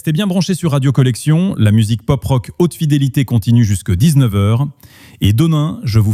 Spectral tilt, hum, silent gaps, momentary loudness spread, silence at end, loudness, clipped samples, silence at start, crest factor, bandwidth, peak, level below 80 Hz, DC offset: -7 dB/octave; none; none; 4 LU; 0 s; -14 LUFS; under 0.1%; 0.05 s; 12 dB; 15 kHz; -2 dBFS; -38 dBFS; under 0.1%